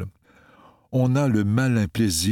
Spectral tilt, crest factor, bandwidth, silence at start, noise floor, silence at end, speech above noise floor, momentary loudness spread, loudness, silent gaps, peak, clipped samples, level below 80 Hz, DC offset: -5.5 dB/octave; 14 dB; 17 kHz; 0 s; -55 dBFS; 0 s; 34 dB; 6 LU; -22 LUFS; none; -8 dBFS; under 0.1%; -48 dBFS; under 0.1%